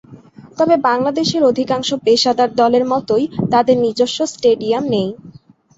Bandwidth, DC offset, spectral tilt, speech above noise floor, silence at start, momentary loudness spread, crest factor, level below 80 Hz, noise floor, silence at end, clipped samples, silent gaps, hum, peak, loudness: 8 kHz; under 0.1%; -5 dB/octave; 25 dB; 0.1 s; 5 LU; 14 dB; -54 dBFS; -40 dBFS; 0.5 s; under 0.1%; none; none; -2 dBFS; -15 LUFS